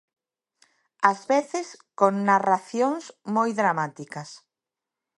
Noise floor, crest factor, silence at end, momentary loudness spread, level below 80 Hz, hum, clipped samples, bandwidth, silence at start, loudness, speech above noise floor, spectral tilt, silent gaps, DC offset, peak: -88 dBFS; 24 dB; 0.8 s; 16 LU; -80 dBFS; none; under 0.1%; 11.5 kHz; 1 s; -24 LUFS; 64 dB; -5.5 dB/octave; none; under 0.1%; -2 dBFS